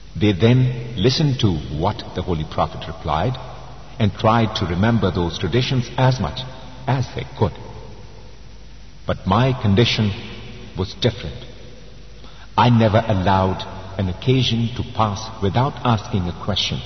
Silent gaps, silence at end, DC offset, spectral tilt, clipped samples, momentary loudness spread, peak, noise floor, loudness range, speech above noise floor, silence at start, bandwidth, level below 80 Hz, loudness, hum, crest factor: none; 0 s; 1%; -6.5 dB/octave; under 0.1%; 16 LU; -2 dBFS; -41 dBFS; 4 LU; 22 dB; 0 s; 6.4 kHz; -40 dBFS; -20 LUFS; none; 18 dB